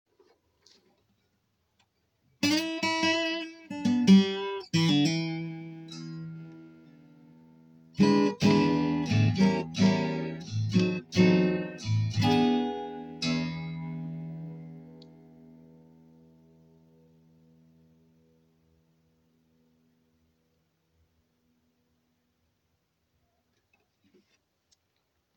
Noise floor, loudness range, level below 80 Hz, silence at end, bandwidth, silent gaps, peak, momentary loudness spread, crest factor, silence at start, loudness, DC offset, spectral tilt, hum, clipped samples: -76 dBFS; 11 LU; -64 dBFS; 10.35 s; 16.5 kHz; none; -8 dBFS; 18 LU; 22 dB; 2.4 s; -27 LUFS; under 0.1%; -6 dB/octave; none; under 0.1%